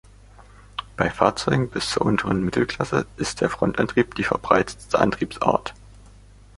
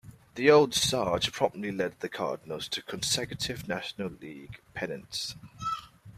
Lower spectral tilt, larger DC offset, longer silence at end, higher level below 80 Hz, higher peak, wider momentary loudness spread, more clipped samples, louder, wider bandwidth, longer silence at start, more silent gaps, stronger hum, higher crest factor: first, -5.5 dB/octave vs -3.5 dB/octave; neither; first, 0.85 s vs 0 s; first, -46 dBFS vs -60 dBFS; first, -2 dBFS vs -8 dBFS; second, 6 LU vs 17 LU; neither; first, -22 LUFS vs -29 LUFS; second, 11.5 kHz vs 15.5 kHz; first, 0.4 s vs 0.05 s; neither; first, 50 Hz at -45 dBFS vs none; about the same, 22 dB vs 22 dB